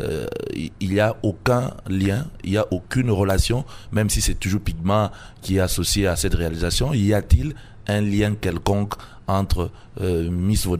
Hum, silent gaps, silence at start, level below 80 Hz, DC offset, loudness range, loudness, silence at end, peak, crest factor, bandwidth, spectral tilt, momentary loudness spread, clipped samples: none; none; 0 s; -30 dBFS; under 0.1%; 2 LU; -22 LUFS; 0 s; -2 dBFS; 20 dB; 16 kHz; -5.5 dB/octave; 8 LU; under 0.1%